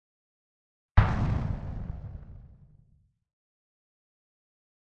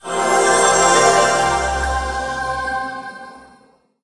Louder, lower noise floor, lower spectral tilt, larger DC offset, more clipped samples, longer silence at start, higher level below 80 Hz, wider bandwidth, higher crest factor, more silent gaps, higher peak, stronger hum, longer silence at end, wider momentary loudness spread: second, -30 LUFS vs -16 LUFS; first, -65 dBFS vs -53 dBFS; first, -8.5 dB/octave vs -2 dB/octave; neither; neither; first, 0.95 s vs 0.05 s; about the same, -36 dBFS vs -34 dBFS; second, 6.6 kHz vs 12 kHz; first, 28 dB vs 16 dB; neither; second, -4 dBFS vs 0 dBFS; neither; first, 2.45 s vs 0.6 s; first, 22 LU vs 15 LU